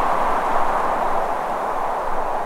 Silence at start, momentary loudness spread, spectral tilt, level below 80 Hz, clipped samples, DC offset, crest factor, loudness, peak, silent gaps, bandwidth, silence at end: 0 s; 3 LU; -4.5 dB/octave; -34 dBFS; under 0.1%; under 0.1%; 14 dB; -22 LUFS; -6 dBFS; none; 14.5 kHz; 0 s